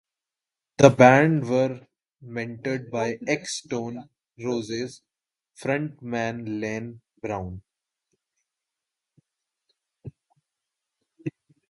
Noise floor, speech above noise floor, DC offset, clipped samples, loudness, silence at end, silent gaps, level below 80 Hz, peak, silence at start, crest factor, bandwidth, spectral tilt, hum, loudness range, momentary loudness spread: -89 dBFS; 66 dB; under 0.1%; under 0.1%; -23 LUFS; 0.4 s; none; -60 dBFS; 0 dBFS; 0.8 s; 26 dB; 11.5 kHz; -6 dB/octave; none; 19 LU; 21 LU